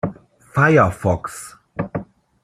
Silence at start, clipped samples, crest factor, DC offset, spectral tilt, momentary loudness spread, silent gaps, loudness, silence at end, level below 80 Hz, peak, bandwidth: 0.05 s; under 0.1%; 18 dB; under 0.1%; -7 dB/octave; 18 LU; none; -19 LUFS; 0.4 s; -48 dBFS; -2 dBFS; 14.5 kHz